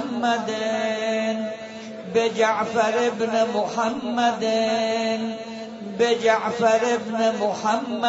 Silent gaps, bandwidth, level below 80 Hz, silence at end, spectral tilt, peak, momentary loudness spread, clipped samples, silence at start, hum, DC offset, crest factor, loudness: none; 8 kHz; -68 dBFS; 0 s; -4 dB/octave; -6 dBFS; 10 LU; under 0.1%; 0 s; none; under 0.1%; 16 dB; -22 LUFS